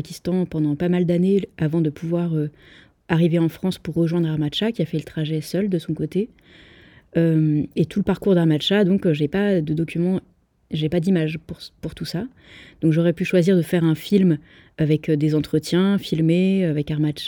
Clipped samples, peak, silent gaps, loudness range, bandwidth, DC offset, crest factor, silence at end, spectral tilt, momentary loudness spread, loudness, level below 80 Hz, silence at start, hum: under 0.1%; -4 dBFS; none; 4 LU; 17.5 kHz; under 0.1%; 18 dB; 0 s; -7.5 dB/octave; 9 LU; -21 LUFS; -52 dBFS; 0 s; none